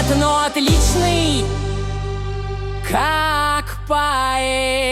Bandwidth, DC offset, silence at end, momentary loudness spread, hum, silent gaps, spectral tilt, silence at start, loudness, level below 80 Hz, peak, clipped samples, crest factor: 16 kHz; under 0.1%; 0 s; 10 LU; none; none; -4 dB/octave; 0 s; -18 LUFS; -26 dBFS; -4 dBFS; under 0.1%; 14 dB